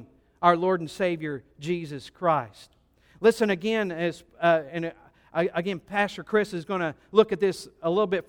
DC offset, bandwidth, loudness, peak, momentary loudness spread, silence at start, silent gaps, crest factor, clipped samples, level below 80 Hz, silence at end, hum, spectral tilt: under 0.1%; 16.5 kHz; -26 LUFS; -6 dBFS; 11 LU; 0 s; none; 22 dB; under 0.1%; -62 dBFS; 0.05 s; none; -6 dB/octave